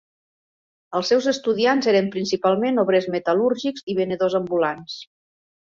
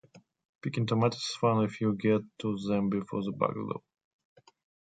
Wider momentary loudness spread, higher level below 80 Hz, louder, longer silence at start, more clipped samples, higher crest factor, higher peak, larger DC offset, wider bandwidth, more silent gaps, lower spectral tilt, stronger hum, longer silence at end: about the same, 7 LU vs 9 LU; about the same, -66 dBFS vs -66 dBFS; first, -21 LUFS vs -31 LUFS; first, 0.9 s vs 0.15 s; neither; about the same, 16 dB vs 18 dB; first, -4 dBFS vs -12 dBFS; neither; second, 7.6 kHz vs 9.2 kHz; second, 3.83-3.87 s vs 0.49-0.59 s; second, -5 dB/octave vs -6.5 dB/octave; neither; second, 0.75 s vs 1.1 s